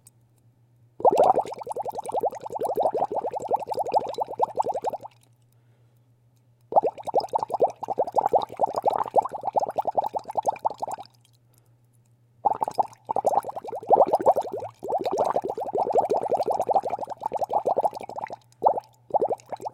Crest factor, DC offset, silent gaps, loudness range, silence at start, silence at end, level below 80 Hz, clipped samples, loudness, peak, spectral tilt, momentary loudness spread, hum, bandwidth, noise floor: 22 dB; under 0.1%; none; 5 LU; 1 s; 0.05 s; -66 dBFS; under 0.1%; -26 LUFS; -4 dBFS; -5.5 dB/octave; 10 LU; none; 16.5 kHz; -61 dBFS